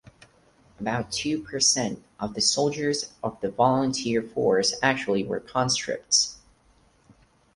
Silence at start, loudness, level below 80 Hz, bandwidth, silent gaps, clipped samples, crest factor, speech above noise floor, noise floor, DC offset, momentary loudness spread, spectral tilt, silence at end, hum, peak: 0.8 s; -25 LUFS; -58 dBFS; 11.5 kHz; none; under 0.1%; 20 dB; 36 dB; -61 dBFS; under 0.1%; 9 LU; -3 dB/octave; 1.2 s; none; -6 dBFS